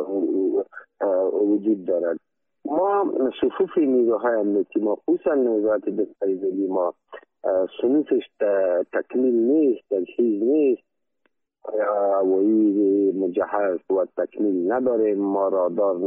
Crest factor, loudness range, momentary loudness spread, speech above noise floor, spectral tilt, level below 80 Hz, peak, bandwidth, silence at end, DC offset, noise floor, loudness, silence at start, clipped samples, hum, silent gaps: 12 dB; 2 LU; 7 LU; 51 dB; -10.5 dB/octave; -70 dBFS; -10 dBFS; 3.7 kHz; 0 s; under 0.1%; -72 dBFS; -22 LUFS; 0 s; under 0.1%; none; none